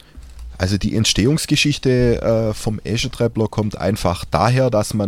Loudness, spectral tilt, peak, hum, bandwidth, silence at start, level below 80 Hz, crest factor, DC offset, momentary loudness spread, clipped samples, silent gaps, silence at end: -18 LUFS; -5 dB/octave; 0 dBFS; none; 16 kHz; 0.15 s; -34 dBFS; 16 dB; under 0.1%; 7 LU; under 0.1%; none; 0 s